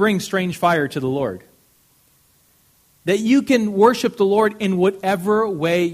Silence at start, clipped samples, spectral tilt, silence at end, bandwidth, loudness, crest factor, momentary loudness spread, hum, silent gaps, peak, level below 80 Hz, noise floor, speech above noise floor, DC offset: 0 s; under 0.1%; -5.5 dB/octave; 0 s; 15.5 kHz; -18 LUFS; 20 dB; 7 LU; none; none; 0 dBFS; -60 dBFS; -57 dBFS; 40 dB; under 0.1%